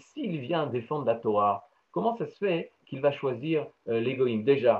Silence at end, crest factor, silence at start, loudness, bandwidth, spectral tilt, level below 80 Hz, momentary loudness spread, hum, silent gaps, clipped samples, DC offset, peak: 0 s; 18 dB; 0.15 s; -29 LUFS; 7 kHz; -8.5 dB/octave; -78 dBFS; 8 LU; none; none; under 0.1%; under 0.1%; -10 dBFS